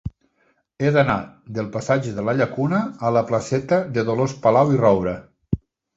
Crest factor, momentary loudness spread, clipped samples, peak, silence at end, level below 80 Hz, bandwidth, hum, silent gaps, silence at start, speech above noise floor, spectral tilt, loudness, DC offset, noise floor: 18 dB; 12 LU; under 0.1%; -4 dBFS; 0.4 s; -46 dBFS; 8 kHz; none; none; 0.05 s; 45 dB; -7 dB/octave; -21 LUFS; under 0.1%; -65 dBFS